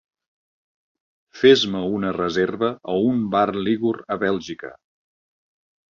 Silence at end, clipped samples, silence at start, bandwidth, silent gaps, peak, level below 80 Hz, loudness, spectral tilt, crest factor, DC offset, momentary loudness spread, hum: 1.2 s; under 0.1%; 1.35 s; 7.4 kHz; none; -2 dBFS; -58 dBFS; -21 LUFS; -5.5 dB/octave; 20 dB; under 0.1%; 11 LU; none